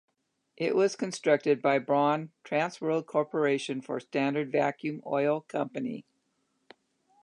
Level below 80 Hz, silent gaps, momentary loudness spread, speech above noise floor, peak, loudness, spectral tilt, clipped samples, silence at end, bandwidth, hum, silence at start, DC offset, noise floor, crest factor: -84 dBFS; none; 8 LU; 47 dB; -12 dBFS; -29 LUFS; -5.5 dB/octave; under 0.1%; 1.2 s; 11 kHz; none; 0.6 s; under 0.1%; -76 dBFS; 18 dB